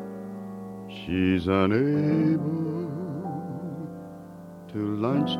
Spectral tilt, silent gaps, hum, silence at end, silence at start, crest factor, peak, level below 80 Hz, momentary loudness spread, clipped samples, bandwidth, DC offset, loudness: -8.5 dB/octave; none; none; 0 s; 0 s; 20 dB; -8 dBFS; -58 dBFS; 16 LU; under 0.1%; 11.5 kHz; under 0.1%; -27 LUFS